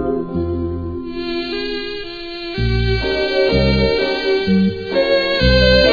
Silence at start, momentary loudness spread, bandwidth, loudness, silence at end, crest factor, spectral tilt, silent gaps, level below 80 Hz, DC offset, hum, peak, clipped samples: 0 s; 12 LU; 5 kHz; -17 LUFS; 0 s; 16 dB; -7 dB/octave; none; -26 dBFS; under 0.1%; none; 0 dBFS; under 0.1%